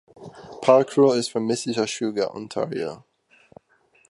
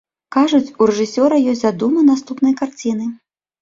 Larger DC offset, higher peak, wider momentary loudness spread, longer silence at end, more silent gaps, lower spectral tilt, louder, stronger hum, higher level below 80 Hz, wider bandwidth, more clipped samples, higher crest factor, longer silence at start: neither; about the same, -2 dBFS vs -2 dBFS; first, 17 LU vs 8 LU; first, 1.15 s vs 0.45 s; neither; about the same, -5 dB/octave vs -5.5 dB/octave; second, -22 LUFS vs -16 LUFS; neither; second, -68 dBFS vs -60 dBFS; first, 11.5 kHz vs 7.6 kHz; neither; first, 22 dB vs 14 dB; about the same, 0.2 s vs 0.3 s